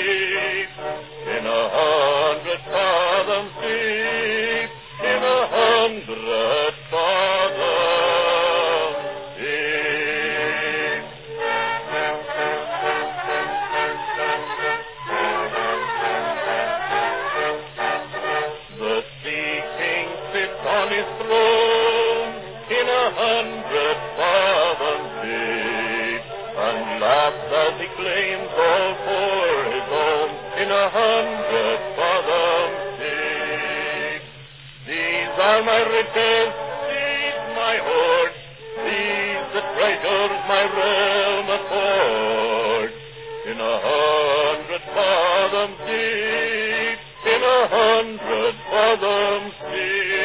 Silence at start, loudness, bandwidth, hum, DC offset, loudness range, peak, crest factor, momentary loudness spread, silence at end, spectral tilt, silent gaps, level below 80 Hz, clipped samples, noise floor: 0 s; -21 LUFS; 4 kHz; none; under 0.1%; 4 LU; -4 dBFS; 18 dB; 8 LU; 0 s; -7 dB/octave; none; -56 dBFS; under 0.1%; -41 dBFS